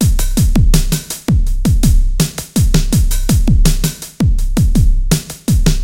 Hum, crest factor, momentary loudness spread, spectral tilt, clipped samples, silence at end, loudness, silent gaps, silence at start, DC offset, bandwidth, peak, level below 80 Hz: none; 12 dB; 4 LU; -5.5 dB/octave; under 0.1%; 0 s; -15 LUFS; none; 0 s; under 0.1%; 16.5 kHz; 0 dBFS; -14 dBFS